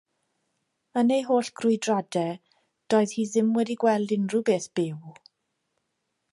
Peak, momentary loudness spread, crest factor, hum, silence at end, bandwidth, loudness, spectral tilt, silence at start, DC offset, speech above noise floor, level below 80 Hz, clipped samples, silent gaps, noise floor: -10 dBFS; 8 LU; 18 dB; none; 1.2 s; 11.5 kHz; -25 LUFS; -5.5 dB/octave; 0.95 s; under 0.1%; 54 dB; -78 dBFS; under 0.1%; none; -78 dBFS